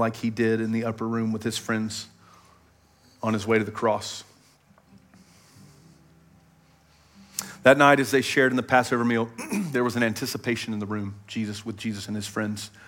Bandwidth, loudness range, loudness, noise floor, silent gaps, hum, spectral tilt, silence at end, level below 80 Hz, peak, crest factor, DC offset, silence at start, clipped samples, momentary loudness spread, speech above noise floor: 17 kHz; 9 LU; -25 LUFS; -59 dBFS; none; none; -5 dB/octave; 0.05 s; -68 dBFS; -4 dBFS; 22 dB; under 0.1%; 0 s; under 0.1%; 13 LU; 34 dB